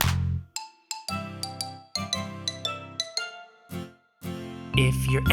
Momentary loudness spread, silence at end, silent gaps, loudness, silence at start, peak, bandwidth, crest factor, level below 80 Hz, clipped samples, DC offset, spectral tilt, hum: 15 LU; 0 s; none; -30 LUFS; 0 s; -4 dBFS; 18 kHz; 26 dB; -42 dBFS; under 0.1%; under 0.1%; -4.5 dB/octave; none